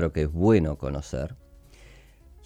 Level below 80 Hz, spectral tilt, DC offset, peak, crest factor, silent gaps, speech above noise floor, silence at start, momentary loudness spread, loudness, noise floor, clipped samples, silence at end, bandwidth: -38 dBFS; -8 dB/octave; under 0.1%; -8 dBFS; 18 dB; none; 27 dB; 0 s; 13 LU; -25 LUFS; -51 dBFS; under 0.1%; 0.6 s; 11 kHz